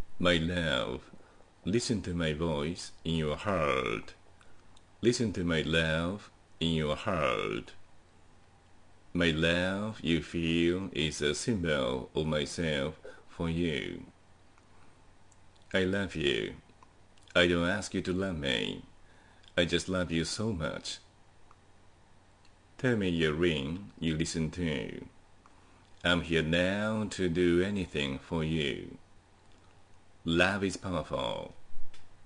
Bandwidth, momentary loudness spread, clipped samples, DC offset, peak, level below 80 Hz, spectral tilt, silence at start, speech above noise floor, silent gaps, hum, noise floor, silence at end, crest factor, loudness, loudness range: 10.5 kHz; 11 LU; under 0.1%; under 0.1%; -10 dBFS; -54 dBFS; -5 dB/octave; 0 s; 29 dB; none; none; -59 dBFS; 0 s; 22 dB; -31 LUFS; 5 LU